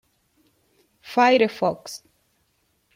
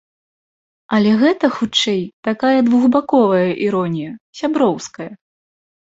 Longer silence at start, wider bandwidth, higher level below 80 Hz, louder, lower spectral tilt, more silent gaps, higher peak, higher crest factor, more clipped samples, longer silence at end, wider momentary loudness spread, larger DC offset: first, 1.05 s vs 0.9 s; first, 16 kHz vs 8 kHz; second, -70 dBFS vs -60 dBFS; second, -20 LUFS vs -16 LUFS; about the same, -4.5 dB/octave vs -5.5 dB/octave; second, none vs 2.13-2.23 s, 4.21-4.33 s; second, -6 dBFS vs -2 dBFS; about the same, 20 dB vs 16 dB; neither; first, 1 s vs 0.75 s; first, 20 LU vs 13 LU; neither